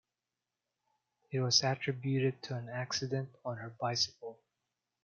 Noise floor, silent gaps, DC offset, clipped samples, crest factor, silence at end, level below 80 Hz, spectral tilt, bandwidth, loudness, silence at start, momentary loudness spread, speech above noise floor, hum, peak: -90 dBFS; none; under 0.1%; under 0.1%; 24 dB; 0.7 s; -78 dBFS; -4 dB/octave; 7.2 kHz; -34 LUFS; 1.3 s; 14 LU; 55 dB; none; -12 dBFS